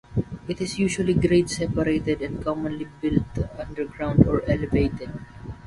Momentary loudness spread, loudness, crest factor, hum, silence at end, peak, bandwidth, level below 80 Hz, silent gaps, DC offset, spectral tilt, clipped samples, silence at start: 12 LU; -24 LUFS; 24 dB; none; 0 s; 0 dBFS; 11.5 kHz; -38 dBFS; none; under 0.1%; -6.5 dB/octave; under 0.1%; 0.1 s